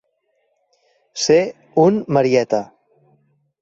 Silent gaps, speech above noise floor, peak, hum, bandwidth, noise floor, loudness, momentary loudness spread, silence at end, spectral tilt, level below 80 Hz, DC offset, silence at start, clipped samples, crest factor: none; 52 dB; -2 dBFS; none; 8.2 kHz; -67 dBFS; -17 LUFS; 10 LU; 0.95 s; -5 dB/octave; -60 dBFS; under 0.1%; 1.15 s; under 0.1%; 18 dB